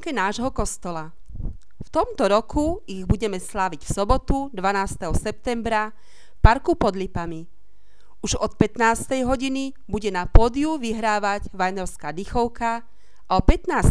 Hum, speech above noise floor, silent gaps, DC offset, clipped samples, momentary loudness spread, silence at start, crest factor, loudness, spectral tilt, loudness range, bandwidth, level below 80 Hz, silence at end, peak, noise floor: none; 38 dB; none; 2%; under 0.1%; 12 LU; 0.05 s; 22 dB; -24 LUFS; -5.5 dB/octave; 3 LU; 11 kHz; -28 dBFS; 0 s; 0 dBFS; -59 dBFS